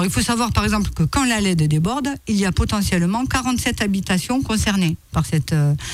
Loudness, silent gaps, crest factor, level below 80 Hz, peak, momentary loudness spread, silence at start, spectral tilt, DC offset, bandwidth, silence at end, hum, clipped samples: -19 LUFS; none; 12 dB; -32 dBFS; -6 dBFS; 3 LU; 0 s; -5 dB/octave; under 0.1%; 16 kHz; 0 s; none; under 0.1%